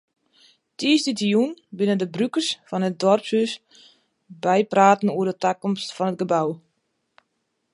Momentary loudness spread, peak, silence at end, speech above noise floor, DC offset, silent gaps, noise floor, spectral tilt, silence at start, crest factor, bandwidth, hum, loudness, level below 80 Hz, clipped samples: 10 LU; -2 dBFS; 1.15 s; 53 dB; under 0.1%; none; -74 dBFS; -5 dB/octave; 0.8 s; 20 dB; 11.5 kHz; none; -22 LUFS; -74 dBFS; under 0.1%